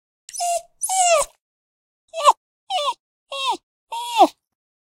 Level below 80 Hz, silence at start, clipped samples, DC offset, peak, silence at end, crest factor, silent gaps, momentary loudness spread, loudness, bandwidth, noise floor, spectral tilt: -62 dBFS; 0.35 s; under 0.1%; under 0.1%; -2 dBFS; 0.65 s; 22 dB; 1.40-2.08 s, 2.37-2.67 s, 3.00-3.26 s, 3.63-3.87 s; 16 LU; -21 LUFS; 16 kHz; under -90 dBFS; 0.5 dB/octave